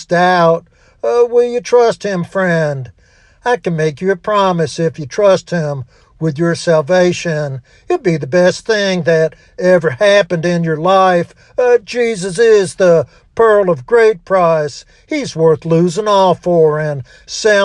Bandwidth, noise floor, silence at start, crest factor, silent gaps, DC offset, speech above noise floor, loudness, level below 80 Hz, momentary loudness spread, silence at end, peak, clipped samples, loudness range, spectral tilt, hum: 10.5 kHz; -48 dBFS; 0 s; 12 dB; none; under 0.1%; 35 dB; -13 LUFS; -50 dBFS; 10 LU; 0 s; 0 dBFS; under 0.1%; 3 LU; -5.5 dB/octave; none